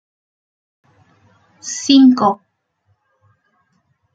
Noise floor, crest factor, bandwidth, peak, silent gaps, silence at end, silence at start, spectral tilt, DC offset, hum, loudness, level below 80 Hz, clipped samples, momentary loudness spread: -65 dBFS; 18 dB; 7.8 kHz; 0 dBFS; none; 1.8 s; 1.65 s; -3.5 dB/octave; under 0.1%; none; -13 LUFS; -66 dBFS; under 0.1%; 19 LU